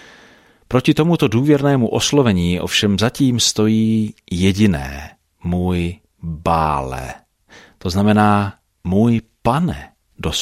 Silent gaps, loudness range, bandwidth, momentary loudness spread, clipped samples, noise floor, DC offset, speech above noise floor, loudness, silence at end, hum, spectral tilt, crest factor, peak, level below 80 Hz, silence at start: none; 5 LU; 15.5 kHz; 14 LU; under 0.1%; -49 dBFS; under 0.1%; 33 dB; -17 LUFS; 0 s; none; -5.5 dB/octave; 16 dB; -2 dBFS; -38 dBFS; 0.7 s